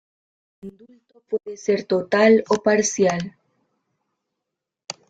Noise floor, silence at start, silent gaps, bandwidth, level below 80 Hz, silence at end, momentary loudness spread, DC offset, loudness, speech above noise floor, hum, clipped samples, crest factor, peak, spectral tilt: -83 dBFS; 0.65 s; none; 9.2 kHz; -66 dBFS; 0.2 s; 17 LU; under 0.1%; -20 LUFS; 63 dB; none; under 0.1%; 20 dB; -4 dBFS; -4.5 dB/octave